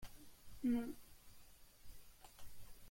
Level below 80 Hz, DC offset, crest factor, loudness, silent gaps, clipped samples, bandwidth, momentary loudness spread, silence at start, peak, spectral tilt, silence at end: -64 dBFS; under 0.1%; 16 dB; -43 LUFS; none; under 0.1%; 16.5 kHz; 24 LU; 0 s; -30 dBFS; -5.5 dB/octave; 0 s